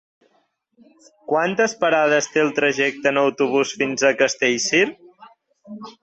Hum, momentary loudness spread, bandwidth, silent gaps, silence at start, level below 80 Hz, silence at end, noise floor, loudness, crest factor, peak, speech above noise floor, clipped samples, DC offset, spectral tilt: none; 5 LU; 8.2 kHz; none; 1.3 s; -68 dBFS; 0.1 s; -65 dBFS; -19 LUFS; 18 dB; -4 dBFS; 46 dB; under 0.1%; under 0.1%; -3 dB/octave